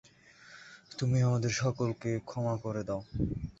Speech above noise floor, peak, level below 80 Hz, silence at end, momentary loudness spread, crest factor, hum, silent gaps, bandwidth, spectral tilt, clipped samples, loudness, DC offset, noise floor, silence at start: 26 dB; -16 dBFS; -52 dBFS; 0.1 s; 22 LU; 16 dB; none; none; 8 kHz; -6 dB/octave; under 0.1%; -33 LUFS; under 0.1%; -57 dBFS; 0.45 s